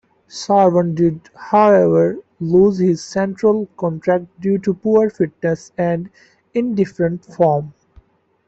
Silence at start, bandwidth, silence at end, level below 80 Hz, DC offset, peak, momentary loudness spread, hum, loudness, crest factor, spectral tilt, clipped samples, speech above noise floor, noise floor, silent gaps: 0.35 s; 8 kHz; 0.75 s; -54 dBFS; under 0.1%; -2 dBFS; 11 LU; none; -17 LUFS; 14 dB; -7.5 dB/octave; under 0.1%; 35 dB; -51 dBFS; none